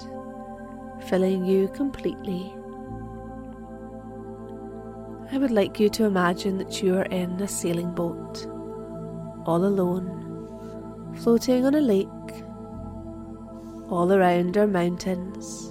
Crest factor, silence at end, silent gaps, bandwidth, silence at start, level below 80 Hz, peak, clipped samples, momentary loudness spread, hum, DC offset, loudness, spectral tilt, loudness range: 18 dB; 0 s; none; 16 kHz; 0 s; -50 dBFS; -8 dBFS; under 0.1%; 18 LU; none; under 0.1%; -25 LUFS; -6 dB/octave; 6 LU